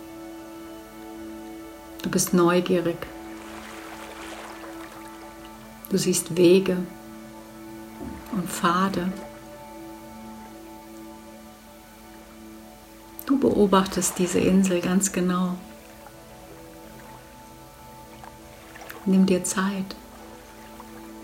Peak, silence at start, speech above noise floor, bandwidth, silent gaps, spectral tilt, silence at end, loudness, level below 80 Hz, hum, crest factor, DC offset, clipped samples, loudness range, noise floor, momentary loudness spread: -6 dBFS; 0 s; 25 dB; 16.5 kHz; none; -5 dB/octave; 0 s; -23 LUFS; -54 dBFS; none; 20 dB; under 0.1%; under 0.1%; 18 LU; -47 dBFS; 24 LU